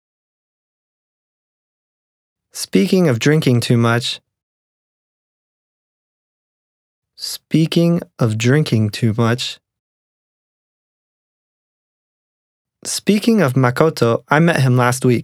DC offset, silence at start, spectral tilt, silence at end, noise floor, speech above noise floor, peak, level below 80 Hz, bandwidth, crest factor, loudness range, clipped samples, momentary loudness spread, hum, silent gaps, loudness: under 0.1%; 2.55 s; -6 dB/octave; 0 s; under -90 dBFS; over 75 dB; 0 dBFS; -62 dBFS; 15.5 kHz; 18 dB; 10 LU; under 0.1%; 12 LU; none; 4.43-7.02 s, 9.79-12.65 s; -16 LUFS